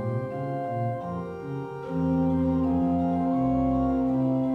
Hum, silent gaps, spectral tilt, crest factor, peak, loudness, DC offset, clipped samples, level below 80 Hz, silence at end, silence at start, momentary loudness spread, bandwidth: none; none; -10.5 dB/octave; 12 dB; -14 dBFS; -27 LUFS; under 0.1%; under 0.1%; -44 dBFS; 0 s; 0 s; 10 LU; 4.2 kHz